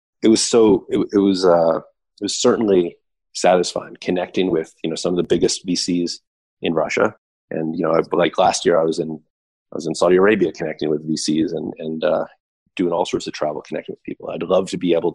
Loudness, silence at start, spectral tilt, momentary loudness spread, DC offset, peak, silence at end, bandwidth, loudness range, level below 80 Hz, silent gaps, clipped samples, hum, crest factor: -19 LUFS; 0.2 s; -4.5 dB/octave; 13 LU; under 0.1%; -4 dBFS; 0 s; 11.5 kHz; 5 LU; -54 dBFS; 6.27-6.57 s, 7.18-7.48 s, 9.30-9.66 s, 12.40-12.66 s; under 0.1%; none; 14 dB